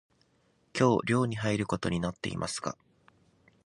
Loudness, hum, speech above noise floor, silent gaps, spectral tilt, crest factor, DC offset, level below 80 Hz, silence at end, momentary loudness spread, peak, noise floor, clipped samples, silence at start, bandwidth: -30 LUFS; none; 40 dB; none; -5.5 dB/octave; 22 dB; under 0.1%; -56 dBFS; 0.95 s; 12 LU; -10 dBFS; -69 dBFS; under 0.1%; 0.75 s; 11.5 kHz